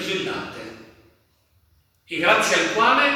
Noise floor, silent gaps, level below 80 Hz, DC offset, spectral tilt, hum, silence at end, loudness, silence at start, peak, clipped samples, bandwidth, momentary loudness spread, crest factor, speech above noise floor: -63 dBFS; none; -62 dBFS; under 0.1%; -2.5 dB/octave; none; 0 s; -20 LUFS; 0 s; -2 dBFS; under 0.1%; 20 kHz; 19 LU; 20 dB; 42 dB